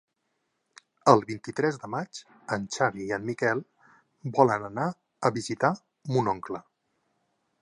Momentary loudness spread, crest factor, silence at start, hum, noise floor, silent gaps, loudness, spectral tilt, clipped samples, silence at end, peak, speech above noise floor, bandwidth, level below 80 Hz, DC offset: 13 LU; 26 dB; 1.05 s; none; -78 dBFS; none; -27 LUFS; -5.5 dB/octave; under 0.1%; 1 s; -2 dBFS; 51 dB; 11 kHz; -68 dBFS; under 0.1%